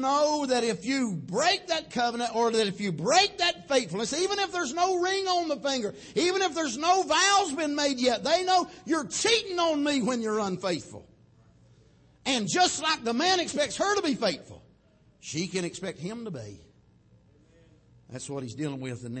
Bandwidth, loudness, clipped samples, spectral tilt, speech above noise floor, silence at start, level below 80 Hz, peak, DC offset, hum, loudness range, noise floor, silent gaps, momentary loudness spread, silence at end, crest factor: 8.8 kHz; -27 LUFS; under 0.1%; -3 dB/octave; 34 dB; 0 s; -64 dBFS; -10 dBFS; under 0.1%; none; 12 LU; -61 dBFS; none; 12 LU; 0 s; 18 dB